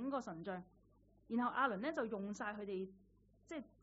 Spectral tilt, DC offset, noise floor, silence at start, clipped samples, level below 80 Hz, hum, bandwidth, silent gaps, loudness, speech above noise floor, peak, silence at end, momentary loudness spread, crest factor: -4.5 dB/octave; under 0.1%; -71 dBFS; 0 s; under 0.1%; -74 dBFS; none; 7.6 kHz; none; -43 LUFS; 28 dB; -24 dBFS; 0.15 s; 14 LU; 20 dB